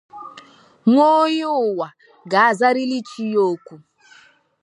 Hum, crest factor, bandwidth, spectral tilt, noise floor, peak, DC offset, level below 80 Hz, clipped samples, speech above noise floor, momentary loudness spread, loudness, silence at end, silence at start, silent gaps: none; 18 dB; 11 kHz; -5.5 dB/octave; -52 dBFS; -2 dBFS; under 0.1%; -78 dBFS; under 0.1%; 34 dB; 17 LU; -18 LUFS; 0.85 s; 0.15 s; none